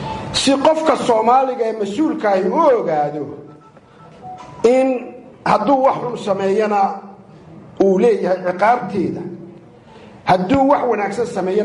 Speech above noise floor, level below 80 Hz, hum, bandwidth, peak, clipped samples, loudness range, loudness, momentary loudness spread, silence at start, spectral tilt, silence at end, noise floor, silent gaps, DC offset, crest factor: 28 dB; -50 dBFS; none; 11.5 kHz; -2 dBFS; under 0.1%; 3 LU; -16 LUFS; 14 LU; 0 s; -5.5 dB/octave; 0 s; -44 dBFS; none; under 0.1%; 16 dB